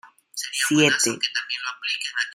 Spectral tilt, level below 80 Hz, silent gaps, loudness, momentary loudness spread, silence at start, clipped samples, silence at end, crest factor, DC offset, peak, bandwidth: -2 dB/octave; -70 dBFS; none; -22 LUFS; 11 LU; 0.05 s; under 0.1%; 0 s; 22 dB; under 0.1%; -4 dBFS; 15.5 kHz